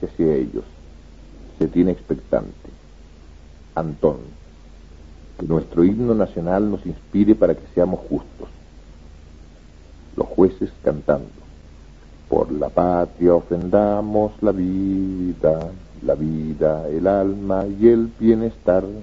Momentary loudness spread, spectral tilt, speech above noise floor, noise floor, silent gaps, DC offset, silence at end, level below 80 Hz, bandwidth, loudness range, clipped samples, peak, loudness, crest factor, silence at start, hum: 11 LU; -10 dB/octave; 25 dB; -44 dBFS; none; 0.2%; 0 s; -40 dBFS; 7.4 kHz; 6 LU; under 0.1%; -2 dBFS; -20 LUFS; 20 dB; 0 s; none